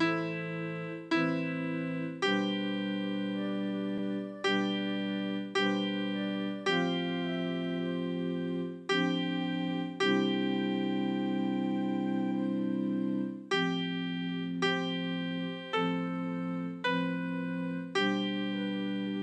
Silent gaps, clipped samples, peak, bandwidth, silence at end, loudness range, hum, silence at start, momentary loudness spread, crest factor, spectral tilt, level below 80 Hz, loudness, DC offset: none; under 0.1%; -16 dBFS; 9.4 kHz; 0 s; 2 LU; none; 0 s; 5 LU; 16 dB; -6 dB/octave; -84 dBFS; -32 LUFS; under 0.1%